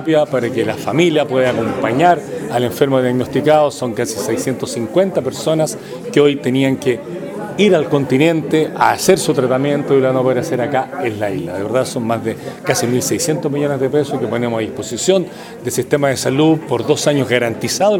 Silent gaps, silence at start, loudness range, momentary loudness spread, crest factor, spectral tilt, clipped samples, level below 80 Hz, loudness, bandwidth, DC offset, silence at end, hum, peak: none; 0 s; 3 LU; 8 LU; 16 dB; -5 dB/octave; under 0.1%; -56 dBFS; -16 LUFS; 19.5 kHz; under 0.1%; 0 s; none; 0 dBFS